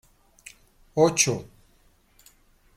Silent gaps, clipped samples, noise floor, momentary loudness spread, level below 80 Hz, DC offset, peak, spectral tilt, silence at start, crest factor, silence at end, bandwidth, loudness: none; under 0.1%; -61 dBFS; 28 LU; -60 dBFS; under 0.1%; -6 dBFS; -3.5 dB/octave; 0.95 s; 22 dB; 1.35 s; 16 kHz; -23 LUFS